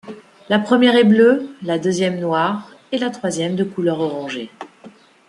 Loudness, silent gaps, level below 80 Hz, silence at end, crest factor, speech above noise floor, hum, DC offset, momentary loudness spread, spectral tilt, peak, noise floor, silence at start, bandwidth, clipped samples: -18 LUFS; none; -66 dBFS; 0.4 s; 16 dB; 28 dB; none; under 0.1%; 17 LU; -5.5 dB/octave; -2 dBFS; -44 dBFS; 0.05 s; 11.5 kHz; under 0.1%